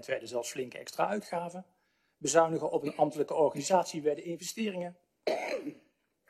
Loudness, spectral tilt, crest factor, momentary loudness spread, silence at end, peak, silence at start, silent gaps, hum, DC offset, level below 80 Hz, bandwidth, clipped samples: -32 LUFS; -4 dB/octave; 22 dB; 12 LU; 0.5 s; -10 dBFS; 0 s; none; none; under 0.1%; -80 dBFS; 14 kHz; under 0.1%